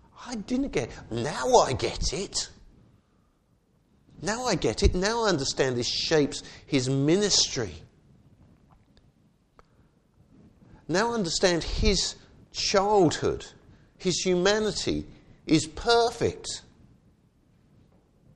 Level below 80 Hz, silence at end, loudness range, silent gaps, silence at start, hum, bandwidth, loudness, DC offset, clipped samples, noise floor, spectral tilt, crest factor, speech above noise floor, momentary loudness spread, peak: -40 dBFS; 1.75 s; 5 LU; none; 0.15 s; none; 12 kHz; -26 LUFS; under 0.1%; under 0.1%; -66 dBFS; -4 dB/octave; 22 dB; 41 dB; 14 LU; -6 dBFS